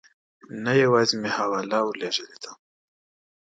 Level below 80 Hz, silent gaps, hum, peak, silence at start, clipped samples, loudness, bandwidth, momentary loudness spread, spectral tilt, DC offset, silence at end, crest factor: -72 dBFS; none; none; -8 dBFS; 0.5 s; under 0.1%; -23 LUFS; 9.2 kHz; 21 LU; -4.5 dB/octave; under 0.1%; 0.9 s; 18 dB